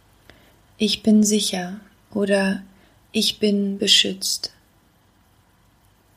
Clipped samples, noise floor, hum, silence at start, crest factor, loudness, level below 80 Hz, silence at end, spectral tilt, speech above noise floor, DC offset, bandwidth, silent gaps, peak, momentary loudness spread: under 0.1%; -58 dBFS; none; 0.8 s; 20 dB; -20 LUFS; -60 dBFS; 1.7 s; -3.5 dB/octave; 38 dB; under 0.1%; 15.5 kHz; none; -2 dBFS; 16 LU